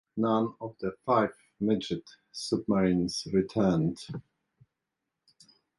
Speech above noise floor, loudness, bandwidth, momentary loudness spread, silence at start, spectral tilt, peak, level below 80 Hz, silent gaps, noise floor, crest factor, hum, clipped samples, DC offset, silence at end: 57 dB; -29 LUFS; 11.5 kHz; 12 LU; 0.15 s; -6.5 dB/octave; -12 dBFS; -60 dBFS; none; -86 dBFS; 20 dB; none; under 0.1%; under 0.1%; 1.6 s